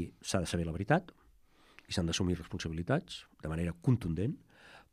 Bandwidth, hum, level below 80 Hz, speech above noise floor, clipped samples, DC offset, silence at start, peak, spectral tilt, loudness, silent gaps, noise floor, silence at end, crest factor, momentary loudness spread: 14.5 kHz; none; -56 dBFS; 30 dB; under 0.1%; under 0.1%; 0 s; -14 dBFS; -5.5 dB/octave; -35 LUFS; none; -64 dBFS; 0.1 s; 22 dB; 8 LU